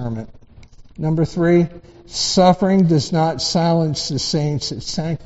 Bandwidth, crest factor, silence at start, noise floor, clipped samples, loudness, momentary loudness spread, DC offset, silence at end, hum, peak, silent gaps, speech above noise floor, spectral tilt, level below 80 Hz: 8.2 kHz; 18 dB; 0 s; -42 dBFS; under 0.1%; -18 LUFS; 12 LU; under 0.1%; 0 s; none; -2 dBFS; none; 25 dB; -5.5 dB/octave; -44 dBFS